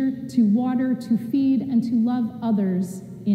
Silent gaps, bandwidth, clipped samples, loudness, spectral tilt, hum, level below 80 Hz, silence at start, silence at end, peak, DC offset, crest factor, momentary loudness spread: none; 12.5 kHz; under 0.1%; -22 LUFS; -8 dB/octave; none; -64 dBFS; 0 s; 0 s; -10 dBFS; under 0.1%; 12 dB; 5 LU